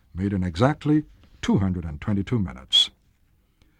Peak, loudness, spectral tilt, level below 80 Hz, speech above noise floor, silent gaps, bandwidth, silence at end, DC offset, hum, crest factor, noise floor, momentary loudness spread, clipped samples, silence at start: -4 dBFS; -23 LUFS; -5.5 dB/octave; -44 dBFS; 40 dB; none; 12.5 kHz; 0.9 s; under 0.1%; none; 22 dB; -63 dBFS; 9 LU; under 0.1%; 0.15 s